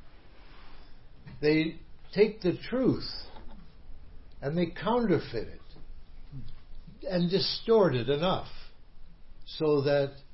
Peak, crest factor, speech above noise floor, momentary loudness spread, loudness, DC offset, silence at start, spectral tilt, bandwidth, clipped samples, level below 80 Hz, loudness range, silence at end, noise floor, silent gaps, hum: -12 dBFS; 20 dB; 22 dB; 20 LU; -29 LUFS; 0.3%; 0 s; -10 dB/octave; 5.8 kHz; under 0.1%; -46 dBFS; 5 LU; 0 s; -50 dBFS; none; none